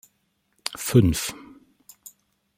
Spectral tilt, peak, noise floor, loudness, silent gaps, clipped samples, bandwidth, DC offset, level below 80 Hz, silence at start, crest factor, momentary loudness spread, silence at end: -5.5 dB/octave; -2 dBFS; -71 dBFS; -23 LUFS; none; under 0.1%; 16.5 kHz; under 0.1%; -46 dBFS; 0.7 s; 24 dB; 26 LU; 1.2 s